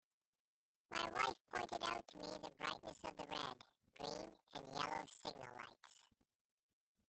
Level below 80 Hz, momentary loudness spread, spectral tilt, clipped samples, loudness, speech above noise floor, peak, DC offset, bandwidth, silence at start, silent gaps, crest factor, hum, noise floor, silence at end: -76 dBFS; 14 LU; -3 dB/octave; under 0.1%; -47 LUFS; 27 dB; -24 dBFS; under 0.1%; 8.8 kHz; 0.9 s; 1.41-1.45 s; 26 dB; none; -74 dBFS; 1.05 s